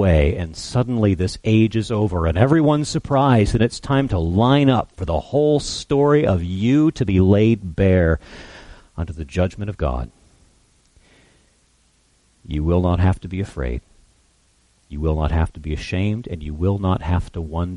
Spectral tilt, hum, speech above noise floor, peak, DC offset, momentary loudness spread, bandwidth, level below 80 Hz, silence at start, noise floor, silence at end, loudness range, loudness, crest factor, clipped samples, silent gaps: -7 dB/octave; none; 41 dB; -2 dBFS; under 0.1%; 13 LU; 11 kHz; -32 dBFS; 0 s; -59 dBFS; 0 s; 11 LU; -19 LUFS; 16 dB; under 0.1%; none